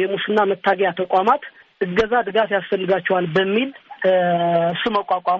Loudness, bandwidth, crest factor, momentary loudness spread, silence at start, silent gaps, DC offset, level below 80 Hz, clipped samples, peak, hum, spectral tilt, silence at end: -19 LUFS; 7.4 kHz; 16 dB; 5 LU; 0 s; none; under 0.1%; -54 dBFS; under 0.1%; -4 dBFS; none; -3 dB/octave; 0 s